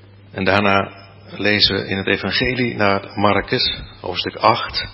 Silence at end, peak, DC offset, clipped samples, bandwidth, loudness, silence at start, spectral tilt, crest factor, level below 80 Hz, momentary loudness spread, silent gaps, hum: 0 s; 0 dBFS; under 0.1%; under 0.1%; 8 kHz; -18 LUFS; 0.35 s; -7 dB/octave; 20 dB; -42 dBFS; 10 LU; none; none